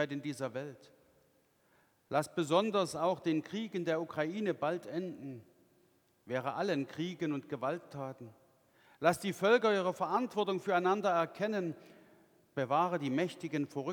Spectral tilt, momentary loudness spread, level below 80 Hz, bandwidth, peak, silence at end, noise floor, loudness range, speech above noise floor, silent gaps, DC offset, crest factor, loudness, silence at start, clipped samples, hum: -5.5 dB/octave; 14 LU; -80 dBFS; 19.5 kHz; -14 dBFS; 0 s; -71 dBFS; 7 LU; 37 dB; none; under 0.1%; 22 dB; -34 LUFS; 0 s; under 0.1%; none